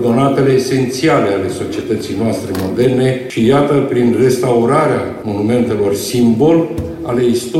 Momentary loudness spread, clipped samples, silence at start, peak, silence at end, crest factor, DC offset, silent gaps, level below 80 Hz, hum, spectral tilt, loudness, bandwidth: 7 LU; under 0.1%; 0 s; -2 dBFS; 0 s; 12 dB; under 0.1%; none; -44 dBFS; none; -6.5 dB/octave; -14 LUFS; 16.5 kHz